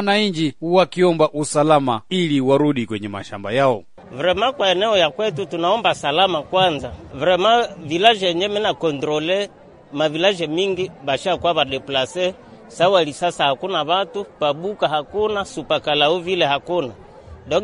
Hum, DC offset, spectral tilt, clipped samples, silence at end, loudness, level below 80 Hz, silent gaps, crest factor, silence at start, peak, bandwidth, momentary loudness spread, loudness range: none; under 0.1%; -4.5 dB/octave; under 0.1%; 0 s; -19 LUFS; -52 dBFS; none; 20 dB; 0 s; 0 dBFS; 10.5 kHz; 8 LU; 3 LU